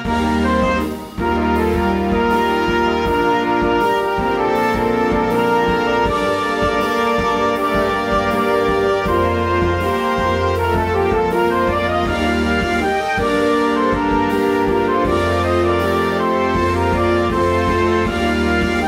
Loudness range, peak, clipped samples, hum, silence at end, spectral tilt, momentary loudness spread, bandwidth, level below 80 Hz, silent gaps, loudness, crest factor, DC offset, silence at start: 1 LU; -4 dBFS; under 0.1%; none; 0 s; -6 dB/octave; 2 LU; 16 kHz; -32 dBFS; none; -17 LUFS; 12 dB; under 0.1%; 0 s